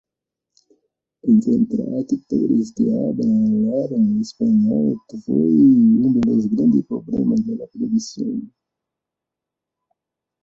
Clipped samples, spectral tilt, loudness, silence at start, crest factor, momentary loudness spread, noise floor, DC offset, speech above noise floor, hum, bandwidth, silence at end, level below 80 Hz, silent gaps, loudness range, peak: under 0.1%; -8.5 dB/octave; -18 LUFS; 1.25 s; 14 dB; 12 LU; -85 dBFS; under 0.1%; 67 dB; none; 7.4 kHz; 2 s; -58 dBFS; none; 7 LU; -4 dBFS